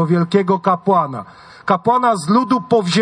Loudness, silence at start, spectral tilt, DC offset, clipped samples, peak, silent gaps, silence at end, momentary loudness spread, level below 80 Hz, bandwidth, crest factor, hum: -16 LUFS; 0 s; -6.5 dB/octave; under 0.1%; under 0.1%; -2 dBFS; none; 0 s; 7 LU; -60 dBFS; 10.5 kHz; 14 dB; none